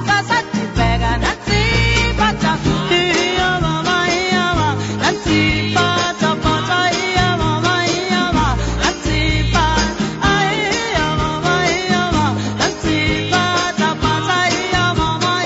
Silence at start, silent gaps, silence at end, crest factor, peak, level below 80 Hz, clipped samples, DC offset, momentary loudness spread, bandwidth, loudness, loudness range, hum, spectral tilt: 0 s; none; 0 s; 14 dB; -2 dBFS; -28 dBFS; under 0.1%; under 0.1%; 3 LU; 8 kHz; -16 LUFS; 1 LU; none; -4.5 dB/octave